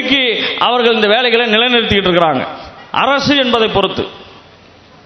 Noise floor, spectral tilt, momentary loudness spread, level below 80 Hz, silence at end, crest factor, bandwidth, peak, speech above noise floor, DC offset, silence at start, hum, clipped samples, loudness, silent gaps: -42 dBFS; -5 dB/octave; 10 LU; -42 dBFS; 0.65 s; 14 dB; 7.6 kHz; 0 dBFS; 30 dB; under 0.1%; 0 s; none; under 0.1%; -12 LUFS; none